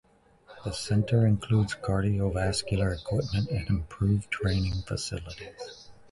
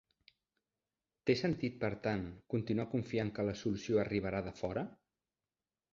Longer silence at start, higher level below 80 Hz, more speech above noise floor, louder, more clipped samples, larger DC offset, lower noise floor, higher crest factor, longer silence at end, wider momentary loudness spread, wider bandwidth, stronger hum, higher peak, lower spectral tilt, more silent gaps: second, 0.5 s vs 1.25 s; first, -42 dBFS vs -62 dBFS; second, 29 dB vs over 54 dB; first, -28 LUFS vs -37 LUFS; neither; neither; second, -56 dBFS vs under -90 dBFS; about the same, 16 dB vs 20 dB; second, 0.2 s vs 1 s; first, 15 LU vs 6 LU; first, 11.5 kHz vs 7.4 kHz; neither; first, -12 dBFS vs -18 dBFS; about the same, -6 dB/octave vs -6 dB/octave; neither